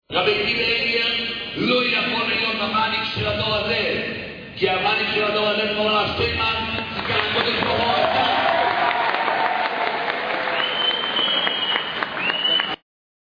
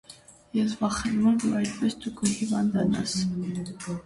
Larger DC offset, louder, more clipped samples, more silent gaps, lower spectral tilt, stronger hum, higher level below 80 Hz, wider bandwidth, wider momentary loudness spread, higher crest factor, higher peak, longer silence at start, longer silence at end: neither; first, -20 LUFS vs -27 LUFS; neither; neither; about the same, -5.5 dB/octave vs -5 dB/octave; neither; about the same, -48 dBFS vs -52 dBFS; second, 5.2 kHz vs 11.5 kHz; second, 5 LU vs 9 LU; about the same, 18 dB vs 16 dB; first, -4 dBFS vs -12 dBFS; about the same, 0.1 s vs 0.1 s; first, 0.45 s vs 0.05 s